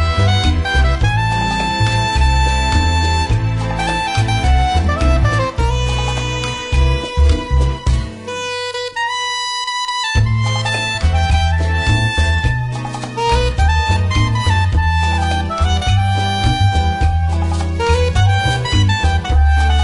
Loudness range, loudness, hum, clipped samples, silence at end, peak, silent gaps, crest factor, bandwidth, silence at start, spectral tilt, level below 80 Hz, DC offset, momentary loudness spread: 3 LU; -16 LUFS; none; under 0.1%; 0 s; -2 dBFS; none; 12 dB; 11 kHz; 0 s; -5 dB/octave; -20 dBFS; under 0.1%; 5 LU